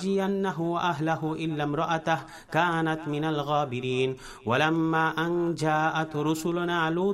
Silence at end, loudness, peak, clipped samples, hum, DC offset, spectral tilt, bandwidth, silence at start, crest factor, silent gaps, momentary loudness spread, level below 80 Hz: 0 s; -27 LUFS; -8 dBFS; under 0.1%; none; under 0.1%; -6 dB/octave; 15 kHz; 0 s; 18 dB; none; 5 LU; -60 dBFS